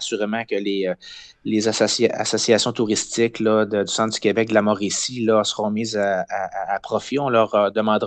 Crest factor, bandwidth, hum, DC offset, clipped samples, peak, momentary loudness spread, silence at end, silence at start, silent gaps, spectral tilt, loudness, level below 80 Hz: 18 dB; 9.4 kHz; none; under 0.1%; under 0.1%; -2 dBFS; 7 LU; 0 s; 0 s; none; -3.5 dB/octave; -20 LUFS; -62 dBFS